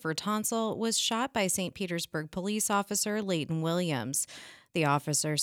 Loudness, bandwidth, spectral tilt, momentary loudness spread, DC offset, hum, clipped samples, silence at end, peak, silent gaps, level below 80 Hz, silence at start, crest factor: -30 LUFS; 17.5 kHz; -3.5 dB/octave; 6 LU; under 0.1%; none; under 0.1%; 0 s; -14 dBFS; none; -68 dBFS; 0.05 s; 18 dB